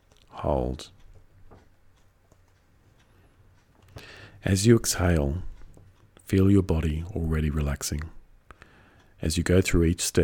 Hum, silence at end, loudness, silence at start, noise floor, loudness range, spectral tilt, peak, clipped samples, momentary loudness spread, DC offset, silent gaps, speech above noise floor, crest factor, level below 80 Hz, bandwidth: none; 0 s; -25 LUFS; 0.35 s; -60 dBFS; 11 LU; -5.5 dB/octave; -6 dBFS; under 0.1%; 24 LU; under 0.1%; none; 37 dB; 20 dB; -38 dBFS; 18.5 kHz